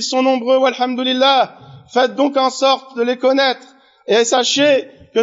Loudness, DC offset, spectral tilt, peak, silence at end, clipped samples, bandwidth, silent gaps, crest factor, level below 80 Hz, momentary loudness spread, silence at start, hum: -15 LUFS; under 0.1%; -0.5 dB/octave; -2 dBFS; 0 s; under 0.1%; 8 kHz; none; 12 dB; -68 dBFS; 8 LU; 0 s; none